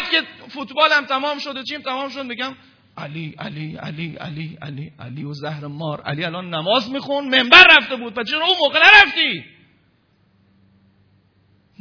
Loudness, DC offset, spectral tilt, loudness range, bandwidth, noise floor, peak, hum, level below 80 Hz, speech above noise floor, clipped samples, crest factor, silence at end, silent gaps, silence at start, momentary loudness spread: -14 LUFS; under 0.1%; -4 dB/octave; 18 LU; 5.4 kHz; -60 dBFS; 0 dBFS; none; -54 dBFS; 42 dB; 0.2%; 18 dB; 2.35 s; none; 0 s; 23 LU